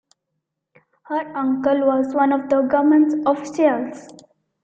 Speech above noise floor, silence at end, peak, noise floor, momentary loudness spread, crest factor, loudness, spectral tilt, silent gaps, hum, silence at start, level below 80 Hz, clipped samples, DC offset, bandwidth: 59 dB; 0.55 s; -4 dBFS; -78 dBFS; 11 LU; 16 dB; -19 LUFS; -6 dB/octave; none; none; 1.1 s; -64 dBFS; under 0.1%; under 0.1%; 8 kHz